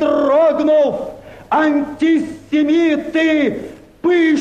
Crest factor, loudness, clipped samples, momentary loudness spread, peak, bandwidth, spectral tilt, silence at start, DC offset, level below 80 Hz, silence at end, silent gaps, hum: 10 dB; -15 LUFS; under 0.1%; 9 LU; -6 dBFS; 9 kHz; -5.5 dB/octave; 0 s; under 0.1%; -52 dBFS; 0 s; none; none